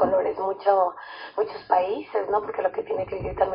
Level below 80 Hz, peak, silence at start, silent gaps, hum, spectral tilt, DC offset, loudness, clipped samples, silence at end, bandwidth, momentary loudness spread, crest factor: -52 dBFS; -6 dBFS; 0 s; none; none; -10 dB/octave; under 0.1%; -25 LUFS; under 0.1%; 0 s; 5.4 kHz; 7 LU; 18 dB